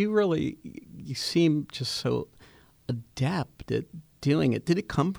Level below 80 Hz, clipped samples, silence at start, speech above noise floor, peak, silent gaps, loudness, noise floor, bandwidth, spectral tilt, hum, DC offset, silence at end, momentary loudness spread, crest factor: -56 dBFS; under 0.1%; 0 s; 29 dB; -10 dBFS; none; -28 LUFS; -56 dBFS; over 20 kHz; -6 dB/octave; none; under 0.1%; 0 s; 19 LU; 18 dB